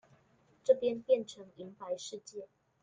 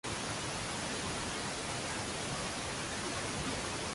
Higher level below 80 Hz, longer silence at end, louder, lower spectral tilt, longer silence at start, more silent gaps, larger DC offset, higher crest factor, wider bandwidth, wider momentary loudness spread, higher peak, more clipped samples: second, -80 dBFS vs -54 dBFS; first, 0.35 s vs 0 s; first, -33 LUFS vs -37 LUFS; first, -4 dB/octave vs -2.5 dB/octave; first, 0.65 s vs 0.05 s; neither; neither; first, 22 dB vs 14 dB; second, 9.4 kHz vs 12 kHz; first, 19 LU vs 1 LU; first, -14 dBFS vs -24 dBFS; neither